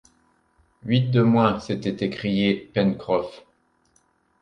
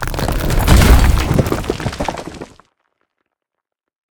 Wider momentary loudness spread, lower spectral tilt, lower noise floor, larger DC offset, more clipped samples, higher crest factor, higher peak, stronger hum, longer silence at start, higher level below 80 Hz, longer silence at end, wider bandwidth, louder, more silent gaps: second, 8 LU vs 20 LU; first, -8 dB/octave vs -5.5 dB/octave; second, -65 dBFS vs -80 dBFS; neither; neither; about the same, 20 dB vs 16 dB; second, -4 dBFS vs 0 dBFS; neither; first, 0.85 s vs 0 s; second, -56 dBFS vs -18 dBFS; second, 1 s vs 1.65 s; second, 9 kHz vs over 20 kHz; second, -22 LUFS vs -15 LUFS; neither